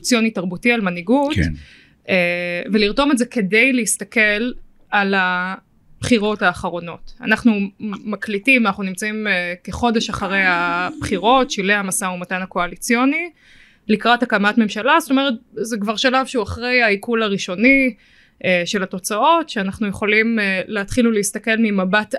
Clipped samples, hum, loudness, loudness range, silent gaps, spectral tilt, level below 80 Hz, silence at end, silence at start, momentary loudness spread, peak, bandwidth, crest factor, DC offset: under 0.1%; none; -18 LUFS; 2 LU; none; -4 dB/octave; -44 dBFS; 0 s; 0 s; 9 LU; -2 dBFS; 13 kHz; 18 dB; under 0.1%